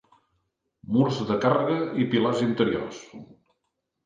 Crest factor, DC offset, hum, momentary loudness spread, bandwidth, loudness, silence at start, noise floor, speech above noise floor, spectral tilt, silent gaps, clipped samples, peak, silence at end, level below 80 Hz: 20 dB; under 0.1%; none; 12 LU; 7.6 kHz; -24 LUFS; 0.9 s; -79 dBFS; 55 dB; -7 dB/octave; none; under 0.1%; -8 dBFS; 0.8 s; -62 dBFS